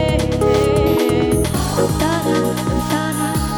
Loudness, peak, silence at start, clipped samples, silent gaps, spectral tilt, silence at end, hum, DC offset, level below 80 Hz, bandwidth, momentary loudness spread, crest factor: -17 LUFS; -4 dBFS; 0 s; under 0.1%; none; -5.5 dB/octave; 0 s; none; under 0.1%; -28 dBFS; over 20 kHz; 4 LU; 14 dB